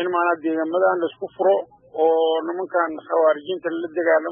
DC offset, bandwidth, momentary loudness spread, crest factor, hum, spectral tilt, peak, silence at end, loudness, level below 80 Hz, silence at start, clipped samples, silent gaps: under 0.1%; 3.6 kHz; 7 LU; 14 dB; none; -9 dB/octave; -6 dBFS; 0 s; -21 LUFS; -76 dBFS; 0 s; under 0.1%; none